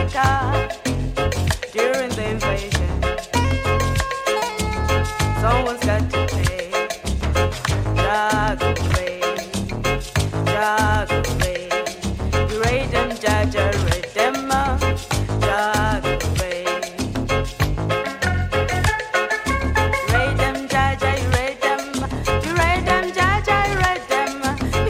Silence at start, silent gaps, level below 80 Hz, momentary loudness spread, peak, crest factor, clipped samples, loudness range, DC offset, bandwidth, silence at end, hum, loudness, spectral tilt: 0 s; none; -30 dBFS; 5 LU; -2 dBFS; 18 dB; under 0.1%; 2 LU; under 0.1%; 16 kHz; 0 s; none; -20 LUFS; -5 dB/octave